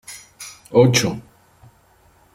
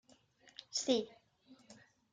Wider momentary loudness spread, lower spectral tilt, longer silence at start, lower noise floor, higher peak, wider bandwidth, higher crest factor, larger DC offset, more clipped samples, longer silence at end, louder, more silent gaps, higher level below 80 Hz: second, 22 LU vs 26 LU; first, -4.5 dB/octave vs -2.5 dB/octave; second, 0.1 s vs 0.75 s; second, -55 dBFS vs -67 dBFS; first, -2 dBFS vs -20 dBFS; first, 16 kHz vs 10 kHz; about the same, 20 dB vs 24 dB; neither; neither; first, 1.15 s vs 0.4 s; first, -17 LUFS vs -37 LUFS; neither; first, -56 dBFS vs -84 dBFS